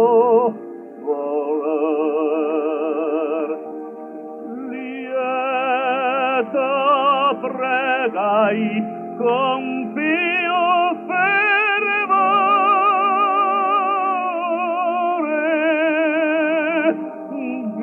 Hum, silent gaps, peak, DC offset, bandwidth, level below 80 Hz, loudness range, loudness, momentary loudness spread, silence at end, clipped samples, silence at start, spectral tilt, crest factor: none; none; -4 dBFS; under 0.1%; 4.2 kHz; -82 dBFS; 7 LU; -19 LUFS; 13 LU; 0 s; under 0.1%; 0 s; -7.5 dB/octave; 14 dB